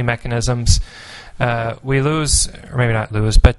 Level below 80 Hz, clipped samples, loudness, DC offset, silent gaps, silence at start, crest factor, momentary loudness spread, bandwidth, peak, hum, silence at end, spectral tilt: -20 dBFS; under 0.1%; -18 LUFS; under 0.1%; none; 0 s; 16 dB; 7 LU; 11.5 kHz; 0 dBFS; none; 0 s; -4.5 dB/octave